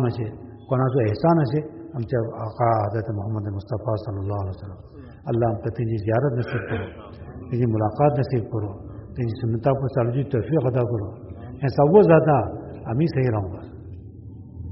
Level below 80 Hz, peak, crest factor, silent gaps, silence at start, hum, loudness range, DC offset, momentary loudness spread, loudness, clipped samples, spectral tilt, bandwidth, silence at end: -48 dBFS; -4 dBFS; 20 dB; none; 0 s; none; 6 LU; under 0.1%; 19 LU; -23 LUFS; under 0.1%; -8.5 dB/octave; 5.8 kHz; 0 s